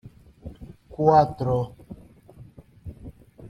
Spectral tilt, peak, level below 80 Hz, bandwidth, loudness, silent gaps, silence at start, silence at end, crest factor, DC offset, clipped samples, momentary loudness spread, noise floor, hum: -9 dB/octave; -4 dBFS; -50 dBFS; 10.5 kHz; -22 LUFS; none; 0.05 s; 0 s; 22 dB; under 0.1%; under 0.1%; 27 LU; -49 dBFS; none